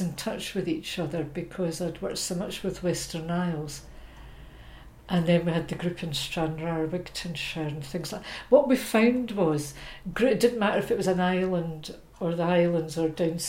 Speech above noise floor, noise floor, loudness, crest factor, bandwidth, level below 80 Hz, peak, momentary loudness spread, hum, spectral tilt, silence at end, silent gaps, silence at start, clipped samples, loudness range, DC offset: 20 dB; -47 dBFS; -28 LUFS; 20 dB; 16.5 kHz; -50 dBFS; -6 dBFS; 11 LU; none; -5.5 dB/octave; 0 s; none; 0 s; under 0.1%; 7 LU; under 0.1%